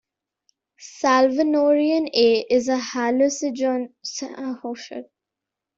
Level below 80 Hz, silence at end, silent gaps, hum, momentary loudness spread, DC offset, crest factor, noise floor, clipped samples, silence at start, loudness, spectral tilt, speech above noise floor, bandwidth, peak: -66 dBFS; 0.75 s; none; none; 14 LU; under 0.1%; 18 dB; -85 dBFS; under 0.1%; 0.8 s; -21 LUFS; -2.5 dB/octave; 65 dB; 7.8 kHz; -4 dBFS